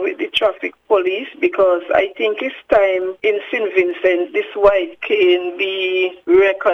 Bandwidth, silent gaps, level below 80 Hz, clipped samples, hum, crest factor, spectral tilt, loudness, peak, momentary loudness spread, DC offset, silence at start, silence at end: 6.4 kHz; none; -50 dBFS; under 0.1%; none; 16 dB; -5 dB/octave; -17 LUFS; 0 dBFS; 6 LU; under 0.1%; 0 s; 0 s